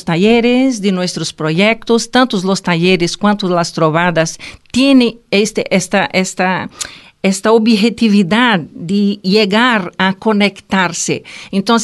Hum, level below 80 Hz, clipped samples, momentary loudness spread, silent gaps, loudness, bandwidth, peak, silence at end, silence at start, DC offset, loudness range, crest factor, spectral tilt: none; -48 dBFS; under 0.1%; 8 LU; none; -13 LUFS; 12.5 kHz; 0 dBFS; 0 s; 0.05 s; under 0.1%; 2 LU; 12 dB; -4.5 dB/octave